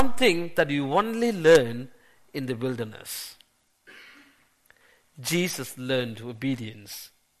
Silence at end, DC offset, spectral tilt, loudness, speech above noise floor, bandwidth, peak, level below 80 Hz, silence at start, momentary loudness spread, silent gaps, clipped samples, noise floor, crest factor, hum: 0 s; under 0.1%; -4.5 dB/octave; -25 LUFS; 37 dB; 13.5 kHz; 0 dBFS; -60 dBFS; 0 s; 20 LU; none; under 0.1%; -63 dBFS; 26 dB; none